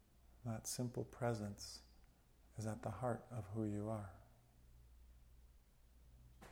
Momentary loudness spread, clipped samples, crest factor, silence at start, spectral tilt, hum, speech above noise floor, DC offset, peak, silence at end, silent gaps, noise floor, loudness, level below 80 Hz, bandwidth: 24 LU; under 0.1%; 20 dB; 0.25 s; -5.5 dB/octave; none; 24 dB; under 0.1%; -30 dBFS; 0 s; none; -69 dBFS; -46 LUFS; -66 dBFS; 18 kHz